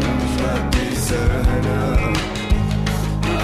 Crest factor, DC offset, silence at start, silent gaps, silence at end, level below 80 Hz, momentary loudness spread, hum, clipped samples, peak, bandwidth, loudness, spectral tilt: 14 dB; under 0.1%; 0 s; none; 0 s; -24 dBFS; 3 LU; none; under 0.1%; -6 dBFS; 15.5 kHz; -20 LUFS; -5.5 dB/octave